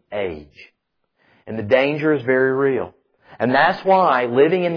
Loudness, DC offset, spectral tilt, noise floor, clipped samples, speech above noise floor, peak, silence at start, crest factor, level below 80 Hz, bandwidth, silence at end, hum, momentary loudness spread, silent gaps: -18 LUFS; under 0.1%; -8 dB/octave; -68 dBFS; under 0.1%; 51 dB; -4 dBFS; 0.1 s; 16 dB; -58 dBFS; 5.4 kHz; 0 s; none; 14 LU; none